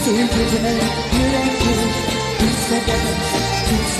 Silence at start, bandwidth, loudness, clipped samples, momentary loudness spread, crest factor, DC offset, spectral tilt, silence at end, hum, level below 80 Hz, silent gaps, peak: 0 s; 13.5 kHz; -18 LUFS; under 0.1%; 2 LU; 12 dB; under 0.1%; -4 dB/octave; 0 s; none; -28 dBFS; none; -6 dBFS